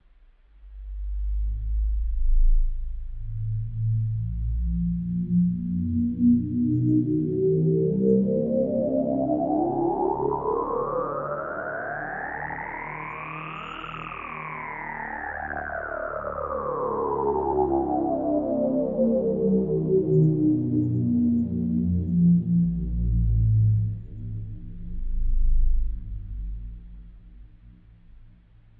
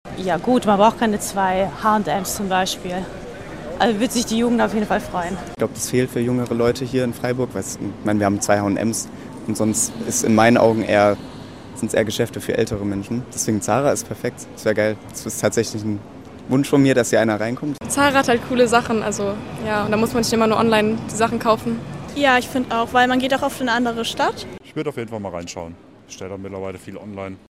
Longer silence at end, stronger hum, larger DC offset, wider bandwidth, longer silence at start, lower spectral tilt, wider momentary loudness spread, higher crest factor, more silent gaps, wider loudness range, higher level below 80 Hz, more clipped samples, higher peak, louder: first, 0.5 s vs 0.1 s; neither; second, under 0.1% vs 0.3%; second, 3.3 kHz vs 16 kHz; first, 0.65 s vs 0.05 s; first, -12 dB/octave vs -4.5 dB/octave; about the same, 14 LU vs 15 LU; about the same, 14 dB vs 18 dB; neither; first, 10 LU vs 4 LU; first, -30 dBFS vs -48 dBFS; neither; second, -10 dBFS vs -2 dBFS; second, -26 LUFS vs -20 LUFS